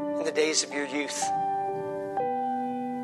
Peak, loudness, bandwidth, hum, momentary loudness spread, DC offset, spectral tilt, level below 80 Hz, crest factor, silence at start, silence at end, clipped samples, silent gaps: -10 dBFS; -29 LUFS; 12.5 kHz; none; 7 LU; under 0.1%; -2.5 dB/octave; -76 dBFS; 18 dB; 0 s; 0 s; under 0.1%; none